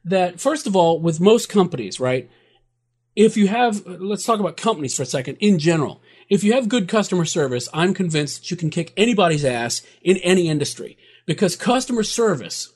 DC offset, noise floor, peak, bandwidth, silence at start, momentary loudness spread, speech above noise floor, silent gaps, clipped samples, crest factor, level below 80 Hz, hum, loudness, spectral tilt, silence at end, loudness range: under 0.1%; -70 dBFS; 0 dBFS; 13.5 kHz; 0.05 s; 9 LU; 51 dB; none; under 0.1%; 18 dB; -58 dBFS; none; -19 LUFS; -5 dB/octave; 0.1 s; 1 LU